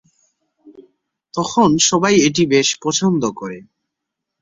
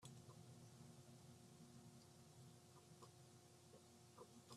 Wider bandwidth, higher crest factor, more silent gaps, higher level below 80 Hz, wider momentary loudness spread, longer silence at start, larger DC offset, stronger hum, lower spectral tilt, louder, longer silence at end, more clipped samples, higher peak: second, 8 kHz vs 13.5 kHz; about the same, 16 dB vs 18 dB; neither; first, -56 dBFS vs -90 dBFS; first, 16 LU vs 3 LU; first, 0.65 s vs 0 s; neither; neither; about the same, -3.5 dB/octave vs -4.5 dB/octave; first, -15 LUFS vs -65 LUFS; first, 0.8 s vs 0 s; neither; first, -2 dBFS vs -46 dBFS